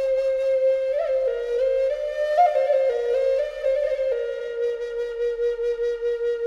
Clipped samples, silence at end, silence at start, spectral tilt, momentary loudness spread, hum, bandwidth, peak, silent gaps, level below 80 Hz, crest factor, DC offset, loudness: under 0.1%; 0 s; 0 s; -2.5 dB/octave; 7 LU; none; 7.6 kHz; -8 dBFS; none; -54 dBFS; 14 dB; under 0.1%; -23 LUFS